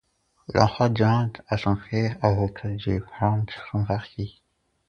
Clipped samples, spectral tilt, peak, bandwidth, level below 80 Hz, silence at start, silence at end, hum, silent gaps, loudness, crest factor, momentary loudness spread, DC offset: under 0.1%; -7.5 dB/octave; 0 dBFS; 6.8 kHz; -46 dBFS; 0.5 s; 0.6 s; none; none; -25 LUFS; 24 dB; 9 LU; under 0.1%